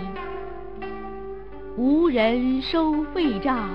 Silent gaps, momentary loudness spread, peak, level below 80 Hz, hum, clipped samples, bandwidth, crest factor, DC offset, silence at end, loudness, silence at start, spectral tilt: none; 17 LU; -10 dBFS; -44 dBFS; none; under 0.1%; 5.6 kHz; 14 dB; 1%; 0 s; -23 LUFS; 0 s; -8 dB/octave